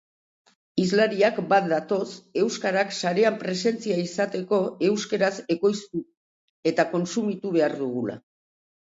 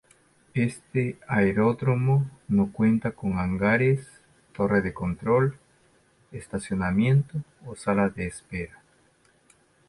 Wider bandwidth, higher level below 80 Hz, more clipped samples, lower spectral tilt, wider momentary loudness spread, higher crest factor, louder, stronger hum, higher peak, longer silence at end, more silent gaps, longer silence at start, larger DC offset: second, 8 kHz vs 11.5 kHz; second, -72 dBFS vs -50 dBFS; neither; second, -5 dB/octave vs -8 dB/octave; second, 8 LU vs 13 LU; about the same, 18 dB vs 16 dB; about the same, -25 LUFS vs -25 LUFS; neither; first, -6 dBFS vs -10 dBFS; second, 0.65 s vs 1.2 s; first, 6.17-6.63 s vs none; first, 0.75 s vs 0.55 s; neither